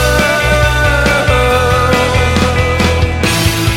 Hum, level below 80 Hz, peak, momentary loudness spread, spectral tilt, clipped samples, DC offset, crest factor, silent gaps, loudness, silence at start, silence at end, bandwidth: none; -18 dBFS; 0 dBFS; 2 LU; -4.5 dB/octave; under 0.1%; under 0.1%; 10 dB; none; -11 LUFS; 0 s; 0 s; 16.5 kHz